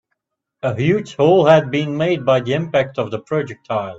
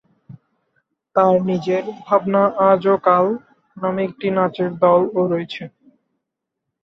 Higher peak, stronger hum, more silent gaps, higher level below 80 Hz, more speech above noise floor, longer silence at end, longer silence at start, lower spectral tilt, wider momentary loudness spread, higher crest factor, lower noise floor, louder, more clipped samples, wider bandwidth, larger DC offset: about the same, 0 dBFS vs -2 dBFS; neither; neither; first, -56 dBFS vs -64 dBFS; second, 58 dB vs 63 dB; second, 0 s vs 1.15 s; first, 0.65 s vs 0.3 s; second, -7 dB/octave vs -8.5 dB/octave; about the same, 11 LU vs 10 LU; about the same, 18 dB vs 18 dB; second, -75 dBFS vs -80 dBFS; about the same, -17 LUFS vs -18 LUFS; neither; first, 7.8 kHz vs 6.4 kHz; neither